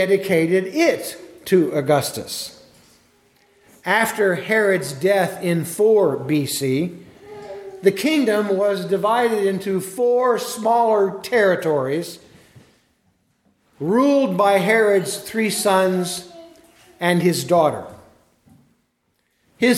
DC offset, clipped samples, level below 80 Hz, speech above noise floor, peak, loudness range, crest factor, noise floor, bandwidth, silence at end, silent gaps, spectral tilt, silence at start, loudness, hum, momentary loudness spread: under 0.1%; under 0.1%; -66 dBFS; 50 dB; -2 dBFS; 4 LU; 18 dB; -68 dBFS; 16.5 kHz; 0 s; none; -5 dB/octave; 0 s; -19 LUFS; none; 12 LU